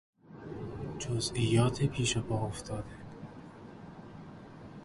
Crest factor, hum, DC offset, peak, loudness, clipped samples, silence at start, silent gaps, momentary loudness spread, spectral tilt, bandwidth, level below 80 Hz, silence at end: 20 dB; none; under 0.1%; -14 dBFS; -33 LUFS; under 0.1%; 0.25 s; none; 21 LU; -5 dB/octave; 11.5 kHz; -54 dBFS; 0 s